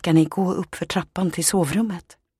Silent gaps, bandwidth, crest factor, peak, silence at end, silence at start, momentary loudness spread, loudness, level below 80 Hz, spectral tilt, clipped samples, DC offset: none; 15 kHz; 16 dB; -6 dBFS; 0.4 s; 0.05 s; 9 LU; -22 LUFS; -52 dBFS; -5 dB/octave; under 0.1%; under 0.1%